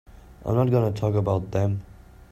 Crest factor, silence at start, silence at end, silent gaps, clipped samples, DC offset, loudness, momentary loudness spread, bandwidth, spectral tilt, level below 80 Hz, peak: 16 dB; 0.15 s; 0.05 s; none; under 0.1%; under 0.1%; -24 LUFS; 8 LU; 14 kHz; -9 dB/octave; -48 dBFS; -8 dBFS